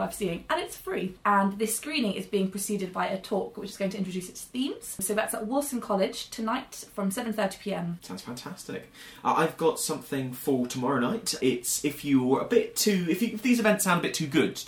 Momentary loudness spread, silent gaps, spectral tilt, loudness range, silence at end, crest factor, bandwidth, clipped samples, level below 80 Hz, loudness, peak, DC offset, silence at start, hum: 11 LU; none; -4 dB/octave; 6 LU; 0 s; 20 dB; 19.5 kHz; under 0.1%; -62 dBFS; -28 LUFS; -8 dBFS; under 0.1%; 0 s; none